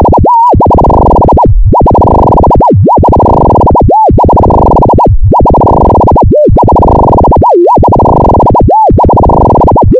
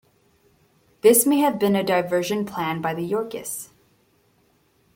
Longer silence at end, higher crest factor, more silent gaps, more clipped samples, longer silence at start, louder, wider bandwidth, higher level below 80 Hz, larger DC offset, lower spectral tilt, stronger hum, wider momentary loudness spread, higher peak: second, 0 s vs 1.3 s; second, 4 dB vs 20 dB; neither; first, 6% vs under 0.1%; second, 0 s vs 1.05 s; first, -4 LUFS vs -21 LUFS; second, 5.2 kHz vs 17 kHz; first, -10 dBFS vs -64 dBFS; neither; first, -11.5 dB/octave vs -4 dB/octave; neither; second, 1 LU vs 14 LU; first, 0 dBFS vs -4 dBFS